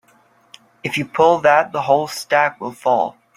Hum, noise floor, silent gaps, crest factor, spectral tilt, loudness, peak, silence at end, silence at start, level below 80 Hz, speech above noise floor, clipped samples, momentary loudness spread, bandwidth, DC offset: none; -55 dBFS; none; 18 dB; -4.5 dB/octave; -17 LUFS; 0 dBFS; 0.25 s; 0.85 s; -62 dBFS; 38 dB; under 0.1%; 9 LU; 16 kHz; under 0.1%